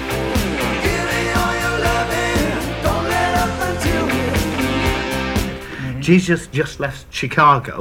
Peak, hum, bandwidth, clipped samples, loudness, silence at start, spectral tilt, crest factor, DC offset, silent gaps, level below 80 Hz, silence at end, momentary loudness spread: 0 dBFS; none; 18 kHz; under 0.1%; -18 LUFS; 0 s; -5 dB/octave; 18 dB; under 0.1%; none; -30 dBFS; 0 s; 8 LU